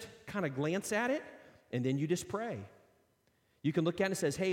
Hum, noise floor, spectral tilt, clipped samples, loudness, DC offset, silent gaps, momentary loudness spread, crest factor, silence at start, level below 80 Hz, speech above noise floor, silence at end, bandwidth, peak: none; -74 dBFS; -5.5 dB/octave; under 0.1%; -35 LUFS; under 0.1%; none; 9 LU; 18 dB; 0 s; -70 dBFS; 40 dB; 0 s; 16.5 kHz; -18 dBFS